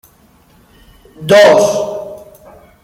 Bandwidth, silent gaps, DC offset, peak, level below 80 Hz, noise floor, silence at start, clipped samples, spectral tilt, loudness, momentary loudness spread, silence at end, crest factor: 16 kHz; none; under 0.1%; 0 dBFS; -50 dBFS; -48 dBFS; 1.2 s; under 0.1%; -4 dB/octave; -9 LUFS; 21 LU; 0.65 s; 14 dB